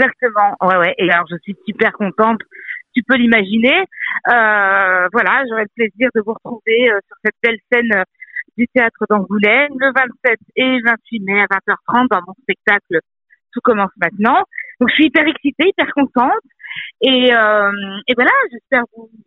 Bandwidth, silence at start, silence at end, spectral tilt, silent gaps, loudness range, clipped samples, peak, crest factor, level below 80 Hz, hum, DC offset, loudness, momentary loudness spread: 4.9 kHz; 0 s; 0.2 s; -7 dB/octave; none; 3 LU; under 0.1%; 0 dBFS; 16 dB; -60 dBFS; none; under 0.1%; -14 LUFS; 10 LU